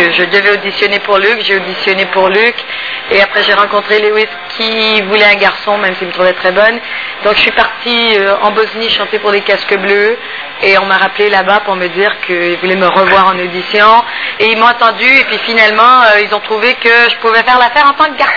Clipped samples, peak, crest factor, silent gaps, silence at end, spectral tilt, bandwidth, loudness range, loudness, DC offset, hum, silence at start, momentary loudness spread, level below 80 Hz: 2%; 0 dBFS; 10 dB; none; 0 s; -4.5 dB/octave; 5.4 kHz; 3 LU; -8 LUFS; 0.5%; none; 0 s; 7 LU; -46 dBFS